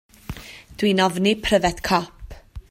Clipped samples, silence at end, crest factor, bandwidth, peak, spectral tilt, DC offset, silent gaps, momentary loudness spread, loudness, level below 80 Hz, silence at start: under 0.1%; 0.1 s; 18 dB; 16 kHz; -4 dBFS; -4.5 dB/octave; under 0.1%; none; 20 LU; -20 LUFS; -42 dBFS; 0.3 s